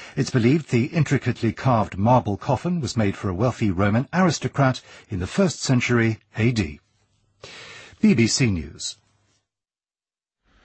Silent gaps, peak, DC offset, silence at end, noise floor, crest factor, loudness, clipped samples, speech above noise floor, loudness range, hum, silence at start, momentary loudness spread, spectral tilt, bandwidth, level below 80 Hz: none; -6 dBFS; under 0.1%; 1.7 s; under -90 dBFS; 18 dB; -22 LUFS; under 0.1%; over 69 dB; 3 LU; none; 0 s; 12 LU; -6 dB/octave; 8.8 kHz; -48 dBFS